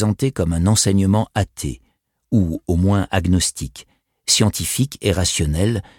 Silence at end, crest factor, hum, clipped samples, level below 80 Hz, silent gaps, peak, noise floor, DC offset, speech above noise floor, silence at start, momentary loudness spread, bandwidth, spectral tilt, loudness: 0.2 s; 16 dB; none; under 0.1%; -34 dBFS; none; -2 dBFS; -39 dBFS; under 0.1%; 21 dB; 0 s; 13 LU; 17 kHz; -4.5 dB/octave; -19 LUFS